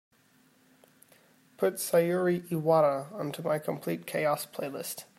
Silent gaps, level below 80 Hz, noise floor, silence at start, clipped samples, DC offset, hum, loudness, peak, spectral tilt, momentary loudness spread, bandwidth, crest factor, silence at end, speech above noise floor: none; -78 dBFS; -64 dBFS; 1.6 s; under 0.1%; under 0.1%; none; -29 LUFS; -12 dBFS; -5.5 dB/octave; 11 LU; 16 kHz; 18 dB; 0.15 s; 35 dB